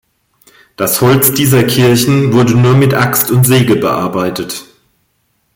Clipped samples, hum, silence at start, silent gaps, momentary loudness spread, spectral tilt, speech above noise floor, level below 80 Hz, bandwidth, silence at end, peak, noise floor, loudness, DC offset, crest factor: under 0.1%; none; 0.8 s; none; 9 LU; -5 dB/octave; 51 dB; -44 dBFS; 17 kHz; 0.95 s; 0 dBFS; -61 dBFS; -10 LUFS; under 0.1%; 12 dB